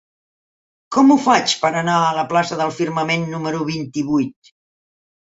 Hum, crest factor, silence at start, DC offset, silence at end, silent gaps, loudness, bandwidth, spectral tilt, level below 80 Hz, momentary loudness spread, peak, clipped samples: none; 18 dB; 0.9 s; under 0.1%; 1 s; none; -18 LUFS; 8 kHz; -4.5 dB/octave; -62 dBFS; 10 LU; 0 dBFS; under 0.1%